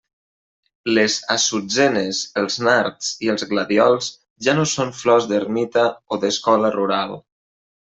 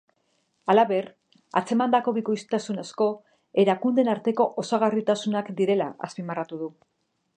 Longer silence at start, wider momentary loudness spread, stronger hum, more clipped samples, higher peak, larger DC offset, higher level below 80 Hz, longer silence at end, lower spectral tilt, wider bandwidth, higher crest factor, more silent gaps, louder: first, 0.85 s vs 0.65 s; second, 7 LU vs 12 LU; neither; neither; first, -2 dBFS vs -6 dBFS; neither; first, -62 dBFS vs -78 dBFS; about the same, 0.65 s vs 0.65 s; second, -3.5 dB/octave vs -6 dB/octave; second, 8.4 kHz vs 9.8 kHz; about the same, 18 dB vs 20 dB; first, 4.30-4.36 s vs none; first, -19 LUFS vs -25 LUFS